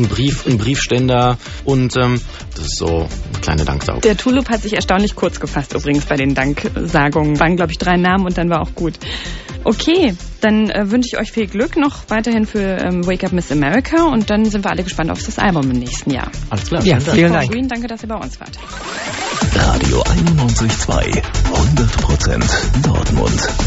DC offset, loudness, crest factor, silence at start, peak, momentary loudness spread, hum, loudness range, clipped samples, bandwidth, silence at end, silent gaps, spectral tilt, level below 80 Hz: under 0.1%; -16 LUFS; 16 dB; 0 s; 0 dBFS; 9 LU; none; 2 LU; under 0.1%; 8.2 kHz; 0 s; none; -5.5 dB/octave; -24 dBFS